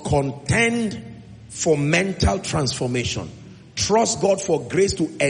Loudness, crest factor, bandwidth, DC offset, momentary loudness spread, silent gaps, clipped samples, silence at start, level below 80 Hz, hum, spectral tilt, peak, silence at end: -21 LUFS; 16 dB; 10 kHz; under 0.1%; 13 LU; none; under 0.1%; 0 s; -40 dBFS; none; -4.5 dB/octave; -4 dBFS; 0 s